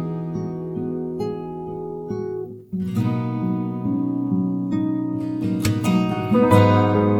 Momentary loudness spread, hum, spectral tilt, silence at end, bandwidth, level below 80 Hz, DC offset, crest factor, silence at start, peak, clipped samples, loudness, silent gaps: 14 LU; none; -8 dB/octave; 0 s; 17 kHz; -50 dBFS; under 0.1%; 20 dB; 0 s; 0 dBFS; under 0.1%; -22 LUFS; none